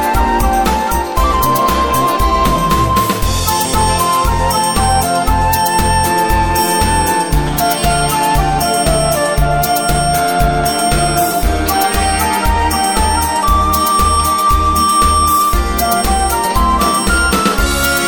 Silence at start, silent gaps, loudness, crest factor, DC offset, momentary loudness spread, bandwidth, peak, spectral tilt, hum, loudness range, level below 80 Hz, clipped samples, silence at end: 0 s; none; -13 LUFS; 12 dB; 2%; 2 LU; 17.5 kHz; 0 dBFS; -3.5 dB/octave; none; 1 LU; -20 dBFS; under 0.1%; 0 s